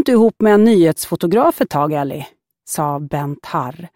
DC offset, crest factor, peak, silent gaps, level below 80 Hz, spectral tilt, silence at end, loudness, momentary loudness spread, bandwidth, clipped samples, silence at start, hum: under 0.1%; 14 dB; -2 dBFS; none; -54 dBFS; -6 dB/octave; 0.1 s; -16 LUFS; 13 LU; 17 kHz; under 0.1%; 0 s; none